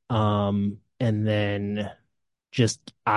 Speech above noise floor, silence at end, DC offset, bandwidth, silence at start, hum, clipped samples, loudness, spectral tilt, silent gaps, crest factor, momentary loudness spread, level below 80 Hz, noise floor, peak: 53 dB; 0 s; under 0.1%; 11.5 kHz; 0.1 s; none; under 0.1%; -26 LUFS; -6 dB/octave; none; 20 dB; 8 LU; -52 dBFS; -77 dBFS; -6 dBFS